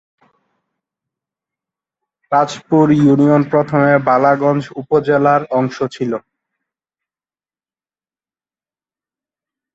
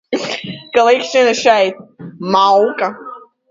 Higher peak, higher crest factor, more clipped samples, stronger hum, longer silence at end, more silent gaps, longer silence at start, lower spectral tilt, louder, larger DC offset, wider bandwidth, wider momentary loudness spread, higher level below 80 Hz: about the same, -2 dBFS vs 0 dBFS; about the same, 16 dB vs 14 dB; neither; neither; first, 3.55 s vs 0.3 s; neither; first, 2.3 s vs 0.1 s; first, -8 dB/octave vs -3.5 dB/octave; about the same, -14 LUFS vs -14 LUFS; neither; about the same, 7.8 kHz vs 7.8 kHz; second, 10 LU vs 16 LU; about the same, -58 dBFS vs -62 dBFS